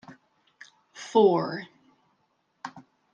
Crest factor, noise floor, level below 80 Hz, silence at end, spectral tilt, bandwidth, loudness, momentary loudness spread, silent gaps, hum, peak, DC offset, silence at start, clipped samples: 22 dB; -72 dBFS; -80 dBFS; 0.35 s; -6 dB/octave; 8.8 kHz; -24 LUFS; 25 LU; none; none; -8 dBFS; under 0.1%; 0.1 s; under 0.1%